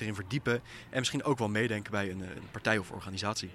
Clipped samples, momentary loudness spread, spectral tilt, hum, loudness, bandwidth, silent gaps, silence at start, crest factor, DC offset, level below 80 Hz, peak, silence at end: under 0.1%; 7 LU; -4.5 dB/octave; none; -33 LUFS; 14 kHz; none; 0 s; 22 dB; under 0.1%; -62 dBFS; -12 dBFS; 0 s